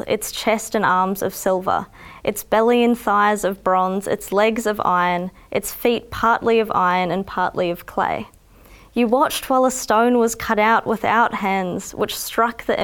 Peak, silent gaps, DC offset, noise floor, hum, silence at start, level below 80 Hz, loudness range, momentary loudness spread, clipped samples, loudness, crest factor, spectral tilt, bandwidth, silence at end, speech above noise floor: -4 dBFS; none; under 0.1%; -46 dBFS; none; 0.05 s; -48 dBFS; 2 LU; 8 LU; under 0.1%; -19 LUFS; 16 dB; -4 dB/octave; 19 kHz; 0 s; 27 dB